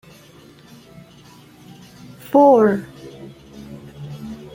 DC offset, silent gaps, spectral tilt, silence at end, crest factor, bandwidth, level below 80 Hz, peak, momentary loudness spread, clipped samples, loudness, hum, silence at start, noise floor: under 0.1%; none; -7.5 dB/octave; 0.2 s; 20 dB; 16 kHz; -56 dBFS; -2 dBFS; 28 LU; under 0.1%; -15 LUFS; none; 2.3 s; -46 dBFS